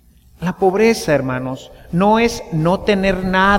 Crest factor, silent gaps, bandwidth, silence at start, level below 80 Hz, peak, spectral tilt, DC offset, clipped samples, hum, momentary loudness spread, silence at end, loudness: 14 dB; none; 16.5 kHz; 0.4 s; -36 dBFS; -2 dBFS; -6 dB/octave; under 0.1%; under 0.1%; none; 11 LU; 0 s; -17 LUFS